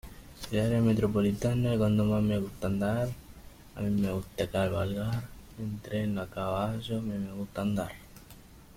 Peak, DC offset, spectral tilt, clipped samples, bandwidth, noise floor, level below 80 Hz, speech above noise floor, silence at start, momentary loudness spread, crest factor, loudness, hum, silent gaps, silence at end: -16 dBFS; under 0.1%; -7.5 dB/octave; under 0.1%; 16.5 kHz; -52 dBFS; -50 dBFS; 23 dB; 0.05 s; 14 LU; 14 dB; -31 LUFS; none; none; 0.15 s